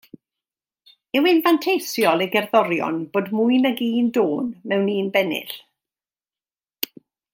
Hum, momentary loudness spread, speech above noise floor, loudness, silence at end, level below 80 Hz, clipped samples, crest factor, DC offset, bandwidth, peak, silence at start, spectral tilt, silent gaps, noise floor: none; 12 LU; over 70 dB; -20 LUFS; 0.5 s; -74 dBFS; under 0.1%; 20 dB; under 0.1%; 16.5 kHz; -2 dBFS; 1.15 s; -5 dB/octave; none; under -90 dBFS